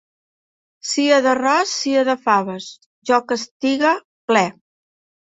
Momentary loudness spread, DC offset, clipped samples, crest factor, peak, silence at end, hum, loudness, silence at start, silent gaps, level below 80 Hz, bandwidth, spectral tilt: 14 LU; under 0.1%; under 0.1%; 18 dB; -2 dBFS; 0.9 s; none; -18 LUFS; 0.85 s; 2.86-3.02 s, 3.51-3.60 s, 4.04-4.28 s; -68 dBFS; 8.4 kHz; -3 dB/octave